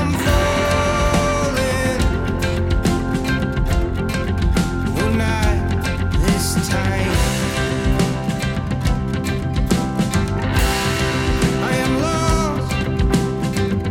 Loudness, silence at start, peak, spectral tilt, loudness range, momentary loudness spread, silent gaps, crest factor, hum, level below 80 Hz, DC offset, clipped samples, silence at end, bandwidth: -19 LUFS; 0 s; -2 dBFS; -5.5 dB/octave; 1 LU; 4 LU; none; 16 dB; none; -24 dBFS; under 0.1%; under 0.1%; 0 s; 16.5 kHz